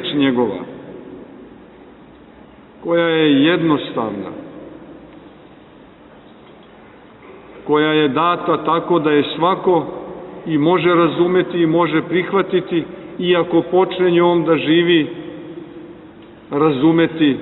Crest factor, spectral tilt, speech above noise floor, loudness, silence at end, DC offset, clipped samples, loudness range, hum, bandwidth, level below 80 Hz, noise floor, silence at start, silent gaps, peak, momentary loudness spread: 14 dB; -10.5 dB/octave; 28 dB; -16 LUFS; 0 s; under 0.1%; under 0.1%; 6 LU; none; 4.2 kHz; -56 dBFS; -43 dBFS; 0 s; none; -2 dBFS; 20 LU